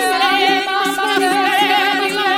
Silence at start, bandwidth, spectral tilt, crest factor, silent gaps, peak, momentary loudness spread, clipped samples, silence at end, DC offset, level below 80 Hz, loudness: 0 s; 16.5 kHz; -1.5 dB/octave; 14 dB; none; -2 dBFS; 3 LU; under 0.1%; 0 s; under 0.1%; -74 dBFS; -14 LUFS